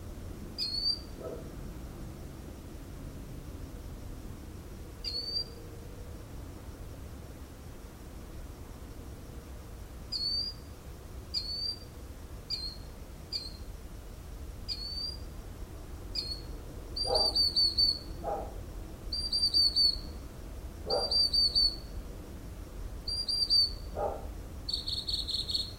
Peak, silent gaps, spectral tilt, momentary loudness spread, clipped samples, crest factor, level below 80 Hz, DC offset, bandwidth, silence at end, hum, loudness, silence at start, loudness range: -16 dBFS; none; -3.5 dB/octave; 22 LU; under 0.1%; 20 dB; -44 dBFS; under 0.1%; 16 kHz; 0 s; none; -30 LUFS; 0 s; 18 LU